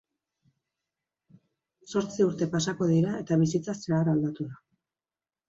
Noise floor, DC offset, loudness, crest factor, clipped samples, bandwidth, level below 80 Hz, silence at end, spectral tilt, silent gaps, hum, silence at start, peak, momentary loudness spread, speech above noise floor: under -90 dBFS; under 0.1%; -27 LUFS; 16 dB; under 0.1%; 8 kHz; -66 dBFS; 0.95 s; -6.5 dB/octave; none; none; 1.85 s; -12 dBFS; 7 LU; over 63 dB